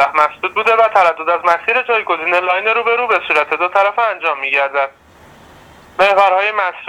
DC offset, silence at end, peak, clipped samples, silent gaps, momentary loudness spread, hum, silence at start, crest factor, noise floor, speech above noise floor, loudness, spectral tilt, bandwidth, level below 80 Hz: under 0.1%; 0 s; 0 dBFS; under 0.1%; none; 5 LU; none; 0 s; 14 dB; -42 dBFS; 28 dB; -14 LUFS; -3 dB/octave; 14 kHz; -58 dBFS